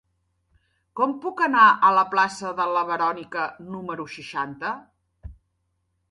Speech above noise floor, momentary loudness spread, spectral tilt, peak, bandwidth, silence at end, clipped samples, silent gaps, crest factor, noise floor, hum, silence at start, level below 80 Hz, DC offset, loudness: 51 dB; 17 LU; -4.5 dB/octave; -2 dBFS; 11.5 kHz; 0.8 s; under 0.1%; none; 22 dB; -73 dBFS; none; 0.95 s; -56 dBFS; under 0.1%; -22 LUFS